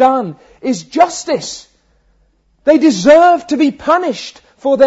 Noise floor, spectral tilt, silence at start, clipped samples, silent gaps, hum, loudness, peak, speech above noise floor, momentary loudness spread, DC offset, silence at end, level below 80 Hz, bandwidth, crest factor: -56 dBFS; -4.5 dB/octave; 0 s; under 0.1%; none; none; -13 LUFS; 0 dBFS; 44 dB; 18 LU; under 0.1%; 0 s; -52 dBFS; 8 kHz; 12 dB